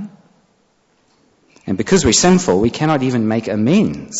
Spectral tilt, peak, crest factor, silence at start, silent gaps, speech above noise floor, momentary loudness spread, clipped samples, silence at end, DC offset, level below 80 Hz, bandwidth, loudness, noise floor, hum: -4.5 dB/octave; -2 dBFS; 14 dB; 0 s; none; 45 dB; 12 LU; under 0.1%; 0 s; under 0.1%; -40 dBFS; 8.2 kHz; -15 LUFS; -59 dBFS; none